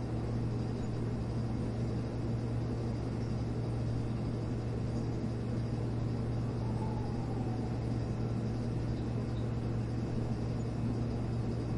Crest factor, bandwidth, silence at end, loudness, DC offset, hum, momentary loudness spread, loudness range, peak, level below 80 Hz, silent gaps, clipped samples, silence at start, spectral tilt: 12 dB; 10.5 kHz; 0 s; -36 LUFS; under 0.1%; none; 1 LU; 0 LU; -24 dBFS; -46 dBFS; none; under 0.1%; 0 s; -8.5 dB/octave